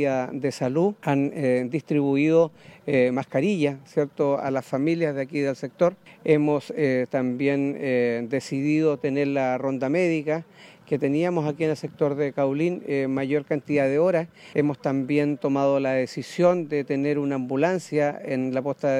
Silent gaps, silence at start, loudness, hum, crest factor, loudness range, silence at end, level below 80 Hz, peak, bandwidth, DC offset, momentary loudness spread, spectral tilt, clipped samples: none; 0 s; -24 LUFS; none; 16 dB; 2 LU; 0 s; -72 dBFS; -6 dBFS; 11.5 kHz; under 0.1%; 5 LU; -7.5 dB/octave; under 0.1%